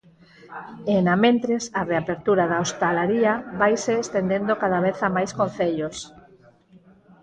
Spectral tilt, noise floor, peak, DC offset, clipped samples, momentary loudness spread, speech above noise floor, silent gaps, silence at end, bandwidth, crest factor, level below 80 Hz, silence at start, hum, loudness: -5.5 dB/octave; -53 dBFS; -6 dBFS; under 0.1%; under 0.1%; 12 LU; 31 dB; none; 1.15 s; 9.4 kHz; 18 dB; -58 dBFS; 0.45 s; none; -22 LUFS